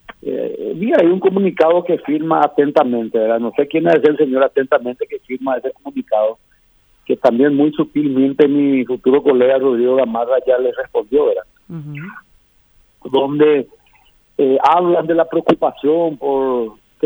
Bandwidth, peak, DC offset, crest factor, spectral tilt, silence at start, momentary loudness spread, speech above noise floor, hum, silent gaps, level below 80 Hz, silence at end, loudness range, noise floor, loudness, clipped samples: over 20 kHz; 0 dBFS; under 0.1%; 14 dB; -8.5 dB/octave; 0.25 s; 11 LU; 40 dB; none; none; -58 dBFS; 0 s; 5 LU; -54 dBFS; -15 LUFS; under 0.1%